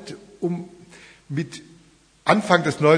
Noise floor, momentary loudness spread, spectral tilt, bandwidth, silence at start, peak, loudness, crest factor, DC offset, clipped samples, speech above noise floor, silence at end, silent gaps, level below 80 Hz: -55 dBFS; 22 LU; -6 dB/octave; 10.5 kHz; 0 s; 0 dBFS; -23 LUFS; 22 dB; under 0.1%; under 0.1%; 35 dB; 0 s; none; -64 dBFS